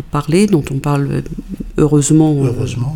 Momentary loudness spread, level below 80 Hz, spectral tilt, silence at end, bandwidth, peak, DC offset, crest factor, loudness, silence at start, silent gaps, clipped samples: 12 LU; -32 dBFS; -6.5 dB/octave; 0 s; 17 kHz; 0 dBFS; under 0.1%; 14 dB; -14 LUFS; 0 s; none; under 0.1%